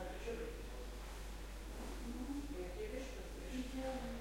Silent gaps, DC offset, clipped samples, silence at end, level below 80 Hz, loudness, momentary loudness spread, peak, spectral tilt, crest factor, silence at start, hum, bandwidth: none; under 0.1%; under 0.1%; 0 s; -50 dBFS; -47 LUFS; 6 LU; -32 dBFS; -5 dB/octave; 14 dB; 0 s; none; 16.5 kHz